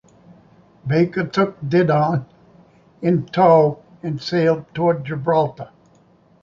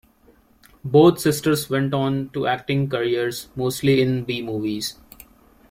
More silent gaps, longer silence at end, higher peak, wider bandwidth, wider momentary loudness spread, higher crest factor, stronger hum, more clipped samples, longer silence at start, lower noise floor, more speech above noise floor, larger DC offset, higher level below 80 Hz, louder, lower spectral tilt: neither; about the same, 0.75 s vs 0.8 s; about the same, -2 dBFS vs -2 dBFS; second, 7.2 kHz vs 16.5 kHz; about the same, 13 LU vs 11 LU; about the same, 18 dB vs 20 dB; neither; neither; about the same, 0.85 s vs 0.85 s; about the same, -54 dBFS vs -56 dBFS; about the same, 36 dB vs 35 dB; neither; about the same, -58 dBFS vs -54 dBFS; about the same, -19 LUFS vs -21 LUFS; first, -8 dB/octave vs -6 dB/octave